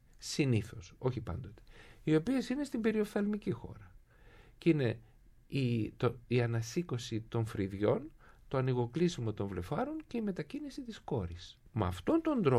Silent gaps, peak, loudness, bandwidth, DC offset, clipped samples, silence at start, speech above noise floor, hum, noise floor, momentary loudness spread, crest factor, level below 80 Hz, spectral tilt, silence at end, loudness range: none; -14 dBFS; -35 LUFS; 14 kHz; under 0.1%; under 0.1%; 0.2 s; 25 dB; none; -59 dBFS; 12 LU; 20 dB; -58 dBFS; -7 dB/octave; 0 s; 2 LU